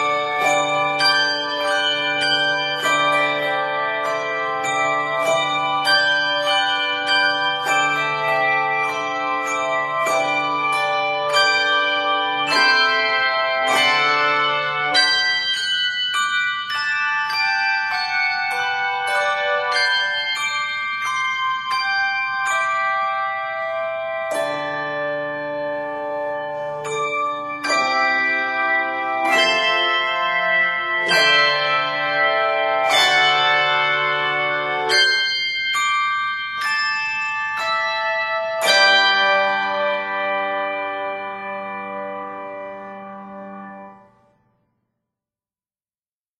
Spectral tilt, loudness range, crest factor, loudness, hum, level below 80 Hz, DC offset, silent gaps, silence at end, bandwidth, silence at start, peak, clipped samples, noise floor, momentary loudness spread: -1.5 dB/octave; 8 LU; 18 dB; -18 LUFS; none; -68 dBFS; under 0.1%; none; 2.45 s; 15 kHz; 0 s; -2 dBFS; under 0.1%; under -90 dBFS; 10 LU